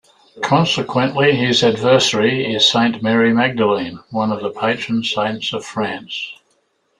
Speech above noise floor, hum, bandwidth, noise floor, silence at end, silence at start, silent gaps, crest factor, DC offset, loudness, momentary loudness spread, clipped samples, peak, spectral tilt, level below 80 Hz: 47 dB; none; 11 kHz; -63 dBFS; 0.65 s; 0.35 s; none; 16 dB; under 0.1%; -16 LUFS; 10 LU; under 0.1%; 0 dBFS; -4.5 dB/octave; -58 dBFS